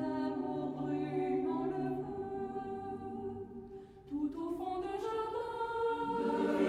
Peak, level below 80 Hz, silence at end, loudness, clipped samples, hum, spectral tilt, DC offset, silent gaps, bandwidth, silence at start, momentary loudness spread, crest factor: -20 dBFS; -64 dBFS; 0 s; -38 LUFS; under 0.1%; none; -7.5 dB/octave; under 0.1%; none; 12 kHz; 0 s; 9 LU; 18 dB